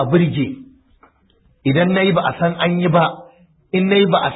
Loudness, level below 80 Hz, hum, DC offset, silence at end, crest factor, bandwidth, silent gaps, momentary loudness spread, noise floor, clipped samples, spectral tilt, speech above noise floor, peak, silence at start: -17 LUFS; -52 dBFS; none; under 0.1%; 0 s; 14 dB; 4 kHz; none; 10 LU; -56 dBFS; under 0.1%; -12 dB/octave; 41 dB; -2 dBFS; 0 s